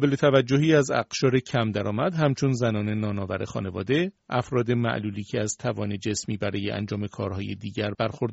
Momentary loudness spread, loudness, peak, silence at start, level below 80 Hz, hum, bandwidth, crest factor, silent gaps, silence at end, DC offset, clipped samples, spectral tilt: 10 LU; -26 LUFS; -6 dBFS; 0 s; -58 dBFS; none; 8 kHz; 18 dB; none; 0 s; under 0.1%; under 0.1%; -5.5 dB/octave